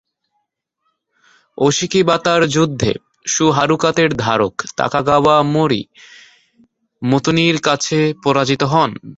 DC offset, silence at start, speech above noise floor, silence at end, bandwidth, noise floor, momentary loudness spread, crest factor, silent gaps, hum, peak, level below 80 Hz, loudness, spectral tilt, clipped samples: under 0.1%; 1.6 s; 56 dB; 0.05 s; 8.2 kHz; -71 dBFS; 7 LU; 16 dB; none; none; 0 dBFS; -48 dBFS; -15 LUFS; -4.5 dB/octave; under 0.1%